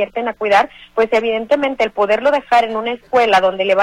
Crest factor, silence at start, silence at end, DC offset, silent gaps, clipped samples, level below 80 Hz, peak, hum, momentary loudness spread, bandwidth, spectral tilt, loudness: 12 dB; 0 s; 0 s; under 0.1%; none; under 0.1%; -52 dBFS; -4 dBFS; none; 7 LU; 12 kHz; -4 dB/octave; -16 LUFS